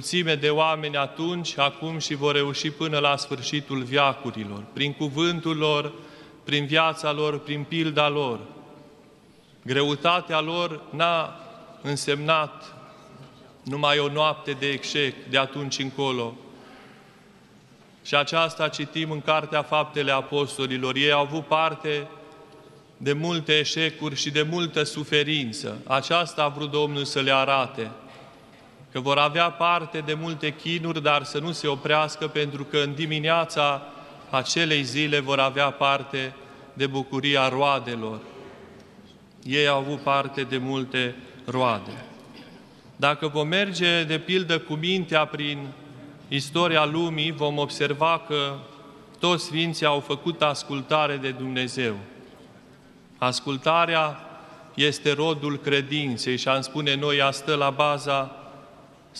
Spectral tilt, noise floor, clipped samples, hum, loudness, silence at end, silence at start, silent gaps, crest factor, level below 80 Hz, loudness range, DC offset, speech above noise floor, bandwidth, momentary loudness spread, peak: -4.5 dB/octave; -54 dBFS; under 0.1%; none; -24 LUFS; 0 s; 0 s; none; 22 dB; -68 dBFS; 3 LU; under 0.1%; 29 dB; 12.5 kHz; 12 LU; -4 dBFS